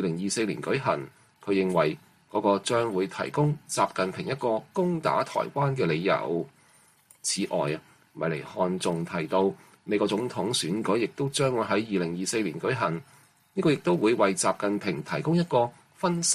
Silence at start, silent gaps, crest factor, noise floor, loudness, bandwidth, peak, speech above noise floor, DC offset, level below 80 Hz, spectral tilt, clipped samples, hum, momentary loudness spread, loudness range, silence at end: 0 s; none; 18 dB; -60 dBFS; -27 LUFS; 15 kHz; -8 dBFS; 34 dB; under 0.1%; -66 dBFS; -4.5 dB/octave; under 0.1%; none; 7 LU; 3 LU; 0 s